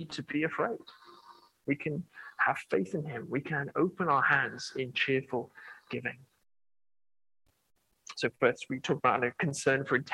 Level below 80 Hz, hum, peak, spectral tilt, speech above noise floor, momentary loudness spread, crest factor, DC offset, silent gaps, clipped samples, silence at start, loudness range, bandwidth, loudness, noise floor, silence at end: -74 dBFS; none; -10 dBFS; -5 dB/octave; 26 dB; 12 LU; 22 dB; under 0.1%; none; under 0.1%; 0 s; 6 LU; 12.5 kHz; -31 LUFS; -58 dBFS; 0 s